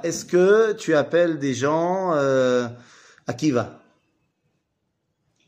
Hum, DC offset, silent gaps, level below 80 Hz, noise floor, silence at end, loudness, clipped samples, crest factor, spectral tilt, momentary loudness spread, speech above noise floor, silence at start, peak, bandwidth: none; under 0.1%; none; -68 dBFS; -75 dBFS; 1.75 s; -21 LUFS; under 0.1%; 16 dB; -5.5 dB/octave; 13 LU; 54 dB; 0.05 s; -6 dBFS; 15.5 kHz